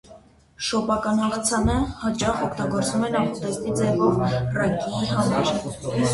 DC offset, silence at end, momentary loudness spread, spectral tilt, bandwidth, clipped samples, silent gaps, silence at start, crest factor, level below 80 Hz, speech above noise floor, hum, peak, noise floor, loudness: under 0.1%; 0 s; 5 LU; -5 dB/octave; 11.5 kHz; under 0.1%; none; 0.1 s; 16 dB; -40 dBFS; 27 dB; none; -8 dBFS; -49 dBFS; -23 LUFS